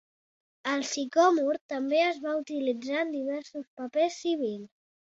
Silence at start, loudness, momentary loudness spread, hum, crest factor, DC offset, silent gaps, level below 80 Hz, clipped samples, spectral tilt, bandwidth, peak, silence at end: 0.65 s; -29 LUFS; 13 LU; none; 20 dB; under 0.1%; 1.61-1.69 s, 3.67-3.77 s; -80 dBFS; under 0.1%; -3 dB/octave; 8 kHz; -10 dBFS; 0.45 s